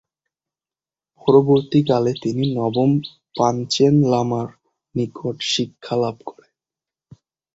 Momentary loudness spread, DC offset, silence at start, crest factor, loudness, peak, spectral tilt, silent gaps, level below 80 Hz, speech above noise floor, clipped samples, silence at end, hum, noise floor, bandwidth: 11 LU; under 0.1%; 1.25 s; 18 dB; -19 LUFS; -2 dBFS; -6.5 dB/octave; none; -58 dBFS; over 72 dB; under 0.1%; 1.25 s; none; under -90 dBFS; 8 kHz